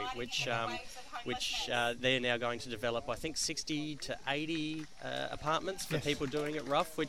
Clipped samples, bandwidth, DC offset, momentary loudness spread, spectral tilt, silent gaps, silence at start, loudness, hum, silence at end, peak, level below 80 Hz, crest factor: under 0.1%; 16 kHz; 0.3%; 9 LU; -3.5 dB/octave; none; 0 s; -35 LUFS; none; 0 s; -16 dBFS; -58 dBFS; 20 dB